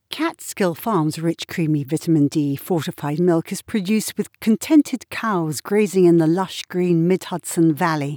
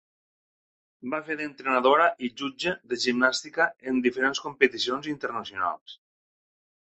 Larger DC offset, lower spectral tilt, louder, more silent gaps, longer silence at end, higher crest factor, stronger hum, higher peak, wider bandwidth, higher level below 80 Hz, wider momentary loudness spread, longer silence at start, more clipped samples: neither; first, -6 dB/octave vs -3 dB/octave; first, -20 LUFS vs -26 LUFS; second, none vs 5.81-5.86 s; second, 0 s vs 0.9 s; second, 14 dB vs 24 dB; neither; about the same, -4 dBFS vs -4 dBFS; first, over 20 kHz vs 8.4 kHz; about the same, -66 dBFS vs -68 dBFS; about the same, 9 LU vs 11 LU; second, 0.1 s vs 1.05 s; neither